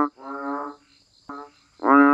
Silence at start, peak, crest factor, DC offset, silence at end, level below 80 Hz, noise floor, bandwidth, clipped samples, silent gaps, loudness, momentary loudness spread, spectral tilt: 0 s; -4 dBFS; 18 dB; under 0.1%; 0 s; -72 dBFS; -58 dBFS; 5.4 kHz; under 0.1%; none; -23 LUFS; 22 LU; -6.5 dB/octave